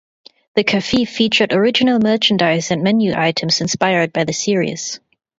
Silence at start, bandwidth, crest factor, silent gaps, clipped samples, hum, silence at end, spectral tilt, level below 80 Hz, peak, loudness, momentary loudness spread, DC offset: 0.55 s; 7.8 kHz; 16 dB; none; under 0.1%; none; 0.4 s; -4 dB/octave; -52 dBFS; 0 dBFS; -16 LUFS; 6 LU; under 0.1%